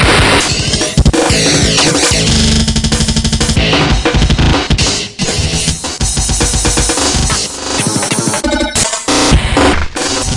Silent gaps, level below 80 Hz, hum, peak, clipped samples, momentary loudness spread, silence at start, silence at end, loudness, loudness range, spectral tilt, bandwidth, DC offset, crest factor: none; -18 dBFS; none; 0 dBFS; under 0.1%; 6 LU; 0 s; 0 s; -11 LUFS; 2 LU; -3.5 dB/octave; 11.5 kHz; under 0.1%; 12 dB